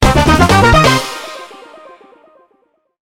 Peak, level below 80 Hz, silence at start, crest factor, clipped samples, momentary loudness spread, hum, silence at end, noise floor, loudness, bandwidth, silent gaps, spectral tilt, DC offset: 0 dBFS; -24 dBFS; 0 s; 12 dB; under 0.1%; 20 LU; none; 1.55 s; -59 dBFS; -9 LUFS; 17.5 kHz; none; -5 dB/octave; under 0.1%